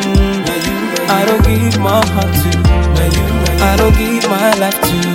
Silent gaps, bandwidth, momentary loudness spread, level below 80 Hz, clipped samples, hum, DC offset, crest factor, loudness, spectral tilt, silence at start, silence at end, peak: none; 17 kHz; 4 LU; -18 dBFS; under 0.1%; none; under 0.1%; 12 dB; -12 LUFS; -5 dB/octave; 0 s; 0 s; 0 dBFS